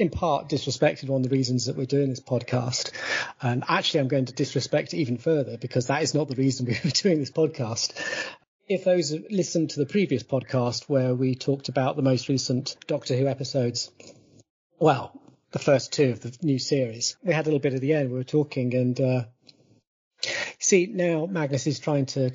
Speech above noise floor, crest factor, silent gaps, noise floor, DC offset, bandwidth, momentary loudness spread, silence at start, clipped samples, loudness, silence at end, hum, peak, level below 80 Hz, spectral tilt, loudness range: 33 dB; 18 dB; 8.47-8.59 s, 14.50-14.70 s, 19.87-20.11 s; -57 dBFS; under 0.1%; 7.6 kHz; 6 LU; 0 s; under 0.1%; -25 LUFS; 0 s; none; -8 dBFS; -60 dBFS; -5 dB/octave; 2 LU